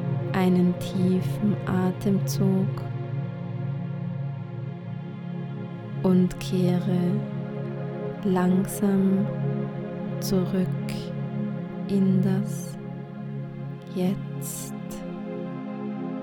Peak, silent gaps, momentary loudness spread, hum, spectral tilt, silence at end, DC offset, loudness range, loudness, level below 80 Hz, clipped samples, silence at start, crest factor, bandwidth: -10 dBFS; none; 12 LU; none; -7.5 dB/octave; 0 s; under 0.1%; 7 LU; -27 LUFS; -54 dBFS; under 0.1%; 0 s; 16 dB; 18.5 kHz